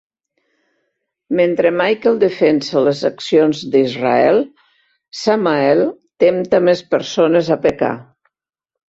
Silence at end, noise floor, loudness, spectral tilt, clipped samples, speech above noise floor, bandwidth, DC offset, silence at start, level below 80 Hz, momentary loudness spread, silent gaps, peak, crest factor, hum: 0.9 s; -83 dBFS; -15 LUFS; -6 dB/octave; under 0.1%; 69 dB; 7.8 kHz; under 0.1%; 1.3 s; -58 dBFS; 7 LU; none; -2 dBFS; 14 dB; none